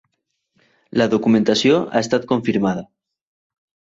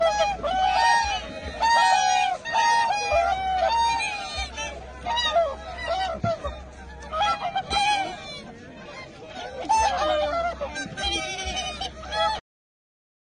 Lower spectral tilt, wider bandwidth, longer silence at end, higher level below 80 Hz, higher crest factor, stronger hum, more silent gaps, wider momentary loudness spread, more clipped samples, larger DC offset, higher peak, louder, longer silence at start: first, -5.5 dB/octave vs -2 dB/octave; second, 7.8 kHz vs 10 kHz; first, 1.1 s vs 0.8 s; second, -58 dBFS vs -44 dBFS; about the same, 18 dB vs 18 dB; neither; neither; second, 7 LU vs 17 LU; neither; neither; first, -2 dBFS vs -8 dBFS; first, -18 LUFS vs -24 LUFS; first, 0.95 s vs 0 s